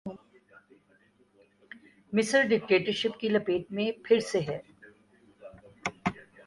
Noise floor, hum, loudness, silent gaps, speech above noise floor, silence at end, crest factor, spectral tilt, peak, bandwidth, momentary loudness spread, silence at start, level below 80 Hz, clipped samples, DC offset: -65 dBFS; 50 Hz at -55 dBFS; -28 LUFS; none; 38 dB; 0.25 s; 20 dB; -4.5 dB/octave; -10 dBFS; 11.5 kHz; 17 LU; 0.05 s; -66 dBFS; under 0.1%; under 0.1%